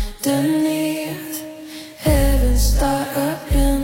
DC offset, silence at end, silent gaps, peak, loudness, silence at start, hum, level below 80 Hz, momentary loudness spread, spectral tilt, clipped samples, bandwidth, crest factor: under 0.1%; 0 s; none; -4 dBFS; -20 LUFS; 0 s; none; -22 dBFS; 12 LU; -5.5 dB/octave; under 0.1%; 16.5 kHz; 14 dB